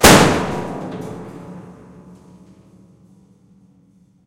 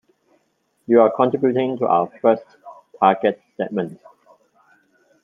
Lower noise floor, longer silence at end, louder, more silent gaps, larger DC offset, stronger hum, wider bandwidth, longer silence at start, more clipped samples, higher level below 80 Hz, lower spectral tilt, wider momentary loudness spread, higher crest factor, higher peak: second, -53 dBFS vs -67 dBFS; first, 2.55 s vs 1.3 s; first, -16 LUFS vs -19 LUFS; neither; neither; neither; first, 16 kHz vs 5.2 kHz; second, 0 s vs 0.9 s; first, 0.2% vs under 0.1%; first, -36 dBFS vs -70 dBFS; second, -3.5 dB/octave vs -9 dB/octave; first, 27 LU vs 11 LU; about the same, 20 dB vs 18 dB; about the same, 0 dBFS vs -2 dBFS